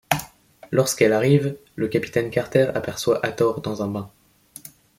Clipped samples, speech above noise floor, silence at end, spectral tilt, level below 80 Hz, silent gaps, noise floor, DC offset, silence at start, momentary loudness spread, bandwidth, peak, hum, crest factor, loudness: under 0.1%; 24 dB; 0.3 s; -5.5 dB/octave; -56 dBFS; none; -45 dBFS; under 0.1%; 0.1 s; 14 LU; 16.5 kHz; -2 dBFS; none; 22 dB; -22 LUFS